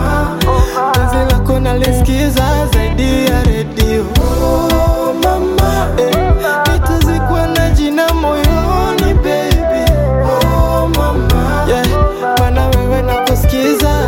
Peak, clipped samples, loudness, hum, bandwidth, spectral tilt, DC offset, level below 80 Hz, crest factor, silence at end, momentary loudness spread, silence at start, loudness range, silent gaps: 0 dBFS; under 0.1%; -13 LUFS; none; 17 kHz; -6 dB/octave; under 0.1%; -16 dBFS; 10 dB; 0 s; 2 LU; 0 s; 0 LU; none